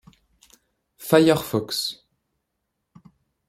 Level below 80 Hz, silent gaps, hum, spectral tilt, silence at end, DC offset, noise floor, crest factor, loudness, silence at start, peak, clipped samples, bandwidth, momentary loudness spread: -62 dBFS; none; none; -5 dB/octave; 1.55 s; under 0.1%; -78 dBFS; 22 dB; -21 LUFS; 1 s; -2 dBFS; under 0.1%; 16 kHz; 19 LU